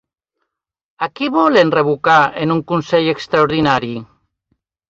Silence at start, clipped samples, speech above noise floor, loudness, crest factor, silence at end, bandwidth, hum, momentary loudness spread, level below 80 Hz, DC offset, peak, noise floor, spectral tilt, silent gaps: 1 s; under 0.1%; 60 dB; -15 LUFS; 16 dB; 0.85 s; 7.6 kHz; none; 12 LU; -54 dBFS; under 0.1%; 0 dBFS; -75 dBFS; -6.5 dB/octave; none